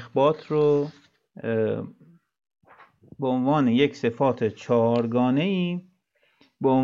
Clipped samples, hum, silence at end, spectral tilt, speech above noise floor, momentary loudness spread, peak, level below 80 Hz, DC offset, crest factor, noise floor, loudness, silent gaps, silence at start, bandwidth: under 0.1%; none; 0 s; -8 dB/octave; 45 dB; 10 LU; -8 dBFS; -72 dBFS; under 0.1%; 16 dB; -67 dBFS; -24 LUFS; none; 0 s; 7.4 kHz